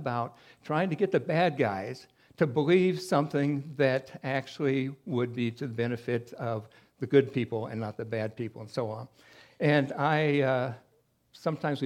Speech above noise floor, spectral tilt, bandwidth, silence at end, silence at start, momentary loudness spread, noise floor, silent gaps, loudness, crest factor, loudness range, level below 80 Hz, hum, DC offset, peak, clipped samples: 38 dB; -7 dB/octave; 13.5 kHz; 0 s; 0 s; 11 LU; -67 dBFS; none; -29 LUFS; 20 dB; 4 LU; -74 dBFS; none; under 0.1%; -10 dBFS; under 0.1%